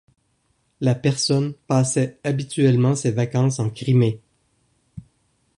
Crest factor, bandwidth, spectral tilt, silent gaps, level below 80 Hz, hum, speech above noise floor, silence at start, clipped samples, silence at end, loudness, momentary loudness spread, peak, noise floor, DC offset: 16 dB; 11 kHz; -6 dB/octave; none; -58 dBFS; none; 47 dB; 0.8 s; under 0.1%; 0.55 s; -21 LUFS; 6 LU; -4 dBFS; -67 dBFS; under 0.1%